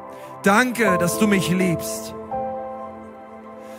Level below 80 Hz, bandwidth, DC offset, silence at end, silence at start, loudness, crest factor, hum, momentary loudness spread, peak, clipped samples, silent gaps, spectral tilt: -54 dBFS; 16.5 kHz; under 0.1%; 0 s; 0 s; -21 LUFS; 20 dB; none; 22 LU; -2 dBFS; under 0.1%; none; -5 dB/octave